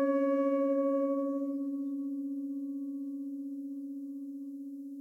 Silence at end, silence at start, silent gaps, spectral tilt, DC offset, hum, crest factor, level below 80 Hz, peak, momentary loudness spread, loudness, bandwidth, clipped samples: 0 s; 0 s; none; -7.5 dB/octave; under 0.1%; none; 14 dB; under -90 dBFS; -20 dBFS; 13 LU; -34 LUFS; 3 kHz; under 0.1%